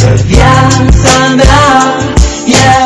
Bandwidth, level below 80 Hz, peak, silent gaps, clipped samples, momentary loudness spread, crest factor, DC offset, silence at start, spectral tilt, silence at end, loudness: 11 kHz; -12 dBFS; 0 dBFS; none; 10%; 5 LU; 4 dB; under 0.1%; 0 s; -4.5 dB/octave; 0 s; -6 LUFS